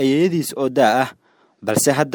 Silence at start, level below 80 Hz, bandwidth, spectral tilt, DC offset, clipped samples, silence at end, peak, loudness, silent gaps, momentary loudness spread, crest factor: 0 s; -62 dBFS; over 20 kHz; -4.5 dB/octave; under 0.1%; under 0.1%; 0 s; -2 dBFS; -18 LUFS; none; 8 LU; 16 dB